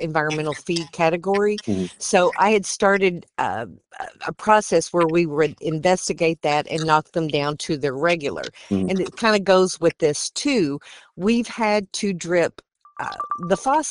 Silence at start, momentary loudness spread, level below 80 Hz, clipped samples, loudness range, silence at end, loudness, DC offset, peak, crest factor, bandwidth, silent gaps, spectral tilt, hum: 0 s; 10 LU; -56 dBFS; under 0.1%; 2 LU; 0 s; -21 LUFS; under 0.1%; -2 dBFS; 20 dB; 11.5 kHz; none; -4.5 dB/octave; none